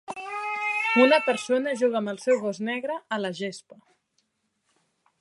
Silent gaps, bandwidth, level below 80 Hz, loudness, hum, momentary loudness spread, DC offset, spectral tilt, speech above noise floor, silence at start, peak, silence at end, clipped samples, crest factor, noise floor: none; 11.5 kHz; -80 dBFS; -25 LUFS; none; 14 LU; under 0.1%; -4 dB/octave; 50 dB; 0.1 s; -6 dBFS; 1.6 s; under 0.1%; 22 dB; -75 dBFS